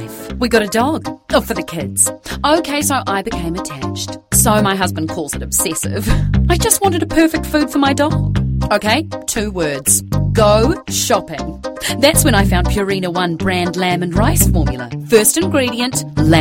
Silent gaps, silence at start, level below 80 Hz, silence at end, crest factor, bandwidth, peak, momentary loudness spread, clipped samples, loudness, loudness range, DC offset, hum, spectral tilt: none; 0 s; -26 dBFS; 0 s; 16 dB; 16.5 kHz; 0 dBFS; 10 LU; under 0.1%; -15 LUFS; 2 LU; under 0.1%; none; -4 dB/octave